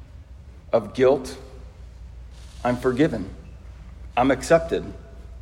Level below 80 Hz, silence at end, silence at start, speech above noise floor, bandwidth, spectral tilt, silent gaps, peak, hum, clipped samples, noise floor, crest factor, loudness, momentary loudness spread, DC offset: -42 dBFS; 0 s; 0 s; 22 dB; 15.5 kHz; -6 dB/octave; none; -4 dBFS; none; under 0.1%; -43 dBFS; 20 dB; -22 LUFS; 24 LU; under 0.1%